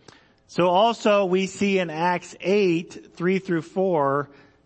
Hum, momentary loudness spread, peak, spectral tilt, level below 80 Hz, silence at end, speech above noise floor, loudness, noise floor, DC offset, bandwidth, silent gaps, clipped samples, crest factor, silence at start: none; 9 LU; -6 dBFS; -6 dB/octave; -68 dBFS; 0.4 s; 31 dB; -23 LUFS; -53 dBFS; under 0.1%; 8.6 kHz; none; under 0.1%; 16 dB; 0.5 s